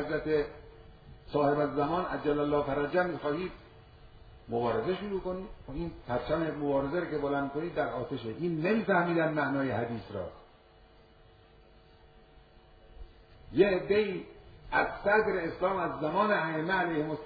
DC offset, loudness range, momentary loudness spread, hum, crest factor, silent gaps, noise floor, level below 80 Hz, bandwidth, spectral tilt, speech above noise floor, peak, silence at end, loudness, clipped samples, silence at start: under 0.1%; 6 LU; 12 LU; none; 20 dB; none; -58 dBFS; -54 dBFS; 5 kHz; -5 dB/octave; 28 dB; -12 dBFS; 0 s; -31 LUFS; under 0.1%; 0 s